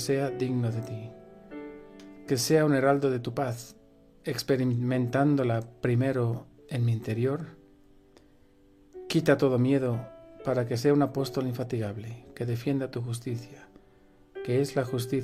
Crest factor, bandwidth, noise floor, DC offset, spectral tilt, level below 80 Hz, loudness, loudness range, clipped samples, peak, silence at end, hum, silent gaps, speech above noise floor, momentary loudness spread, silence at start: 20 dB; 15 kHz; -59 dBFS; under 0.1%; -6.5 dB/octave; -62 dBFS; -28 LUFS; 5 LU; under 0.1%; -10 dBFS; 0 s; none; none; 31 dB; 19 LU; 0 s